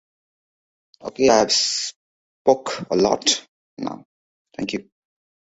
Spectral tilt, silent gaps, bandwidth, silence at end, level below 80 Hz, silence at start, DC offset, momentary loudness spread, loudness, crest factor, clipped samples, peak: -2.5 dB/octave; 1.96-2.45 s, 3.48-3.77 s, 4.05-4.45 s; 8.2 kHz; 0.6 s; -58 dBFS; 1.05 s; under 0.1%; 18 LU; -20 LUFS; 22 dB; under 0.1%; -2 dBFS